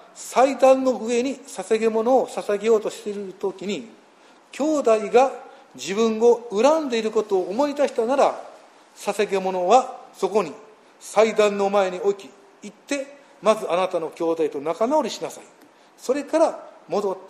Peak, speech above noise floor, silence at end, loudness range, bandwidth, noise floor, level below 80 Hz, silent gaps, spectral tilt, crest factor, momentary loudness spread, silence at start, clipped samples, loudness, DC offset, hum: -4 dBFS; 31 dB; 0 s; 4 LU; 14 kHz; -52 dBFS; -74 dBFS; none; -4.5 dB/octave; 18 dB; 14 LU; 0.15 s; under 0.1%; -22 LUFS; under 0.1%; none